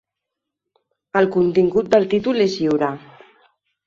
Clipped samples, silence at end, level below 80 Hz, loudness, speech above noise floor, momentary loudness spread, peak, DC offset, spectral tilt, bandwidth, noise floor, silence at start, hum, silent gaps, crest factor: under 0.1%; 0.9 s; -58 dBFS; -18 LUFS; 65 dB; 7 LU; -2 dBFS; under 0.1%; -6.5 dB/octave; 7.6 kHz; -82 dBFS; 1.15 s; none; none; 18 dB